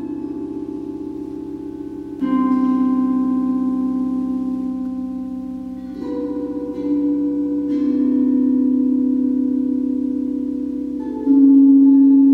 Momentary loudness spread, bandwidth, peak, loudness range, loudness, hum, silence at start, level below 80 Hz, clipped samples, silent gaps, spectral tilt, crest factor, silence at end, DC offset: 18 LU; 3 kHz; -4 dBFS; 7 LU; -18 LUFS; none; 0 s; -50 dBFS; under 0.1%; none; -9.5 dB/octave; 14 dB; 0 s; under 0.1%